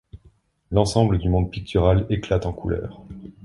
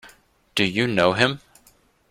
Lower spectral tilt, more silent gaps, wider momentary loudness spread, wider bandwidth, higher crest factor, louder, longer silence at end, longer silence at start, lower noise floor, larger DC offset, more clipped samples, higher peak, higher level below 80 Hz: first, -7 dB/octave vs -5 dB/octave; neither; first, 13 LU vs 9 LU; second, 11.5 kHz vs 16 kHz; about the same, 20 dB vs 22 dB; about the same, -22 LUFS vs -21 LUFS; second, 0.15 s vs 0.75 s; about the same, 0.15 s vs 0.05 s; about the same, -57 dBFS vs -58 dBFS; neither; neither; about the same, -2 dBFS vs -2 dBFS; first, -34 dBFS vs -56 dBFS